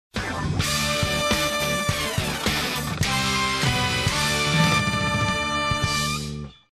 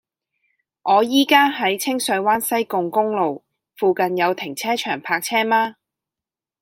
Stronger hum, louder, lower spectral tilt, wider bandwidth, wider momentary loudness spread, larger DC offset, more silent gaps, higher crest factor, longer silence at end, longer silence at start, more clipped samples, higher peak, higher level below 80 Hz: neither; second, -22 LUFS vs -19 LUFS; about the same, -3.5 dB/octave vs -3 dB/octave; second, 14.5 kHz vs 16.5 kHz; about the same, 6 LU vs 8 LU; neither; neither; about the same, 16 dB vs 20 dB; second, 0.2 s vs 0.9 s; second, 0.15 s vs 0.85 s; neither; second, -8 dBFS vs -2 dBFS; first, -38 dBFS vs -70 dBFS